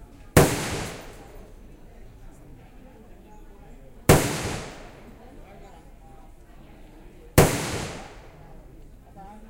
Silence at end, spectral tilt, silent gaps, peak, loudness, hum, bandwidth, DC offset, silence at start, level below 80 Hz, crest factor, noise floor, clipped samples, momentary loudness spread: 0.05 s; -5 dB/octave; none; -2 dBFS; -23 LUFS; none; 16 kHz; under 0.1%; 0 s; -40 dBFS; 26 dB; -47 dBFS; under 0.1%; 28 LU